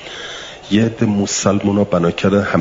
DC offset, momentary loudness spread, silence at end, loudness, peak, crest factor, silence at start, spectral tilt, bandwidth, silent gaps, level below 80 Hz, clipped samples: under 0.1%; 13 LU; 0 s; -16 LUFS; -2 dBFS; 14 dB; 0 s; -5 dB/octave; 7.8 kHz; none; -48 dBFS; under 0.1%